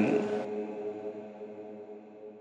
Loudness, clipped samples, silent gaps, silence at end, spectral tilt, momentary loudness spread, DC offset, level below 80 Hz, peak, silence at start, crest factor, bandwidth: -36 LUFS; under 0.1%; none; 0 s; -7.5 dB/octave; 17 LU; under 0.1%; -84 dBFS; -14 dBFS; 0 s; 20 dB; 8.8 kHz